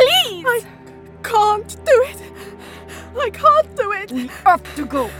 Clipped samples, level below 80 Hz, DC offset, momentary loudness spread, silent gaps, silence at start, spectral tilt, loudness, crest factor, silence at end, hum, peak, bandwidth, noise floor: under 0.1%; -48 dBFS; under 0.1%; 21 LU; none; 0 s; -3 dB/octave; -17 LUFS; 18 dB; 0 s; none; 0 dBFS; 17.5 kHz; -39 dBFS